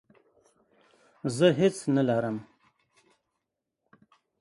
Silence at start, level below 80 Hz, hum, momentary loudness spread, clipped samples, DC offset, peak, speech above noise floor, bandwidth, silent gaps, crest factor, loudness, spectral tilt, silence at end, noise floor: 1.25 s; -70 dBFS; none; 13 LU; under 0.1%; under 0.1%; -8 dBFS; 59 dB; 11.5 kHz; none; 22 dB; -26 LUFS; -6 dB/octave; 1.95 s; -84 dBFS